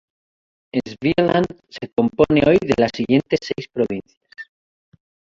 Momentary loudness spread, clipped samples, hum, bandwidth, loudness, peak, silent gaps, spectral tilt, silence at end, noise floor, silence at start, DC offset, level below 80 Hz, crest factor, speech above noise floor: 19 LU; under 0.1%; none; 7.8 kHz; -19 LUFS; -2 dBFS; 4.17-4.21 s; -7 dB/octave; 0.9 s; under -90 dBFS; 0.75 s; under 0.1%; -48 dBFS; 18 dB; over 72 dB